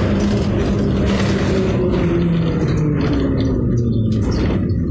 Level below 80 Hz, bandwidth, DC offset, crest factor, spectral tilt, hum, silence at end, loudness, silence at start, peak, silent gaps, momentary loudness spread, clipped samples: -26 dBFS; 8 kHz; under 0.1%; 10 dB; -8 dB/octave; none; 0 s; -17 LUFS; 0 s; -6 dBFS; none; 1 LU; under 0.1%